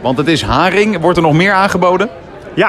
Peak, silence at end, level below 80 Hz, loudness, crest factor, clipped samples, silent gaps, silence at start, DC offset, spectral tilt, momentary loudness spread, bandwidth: 0 dBFS; 0 s; -34 dBFS; -11 LUFS; 12 dB; under 0.1%; none; 0 s; under 0.1%; -5.5 dB/octave; 9 LU; 13.5 kHz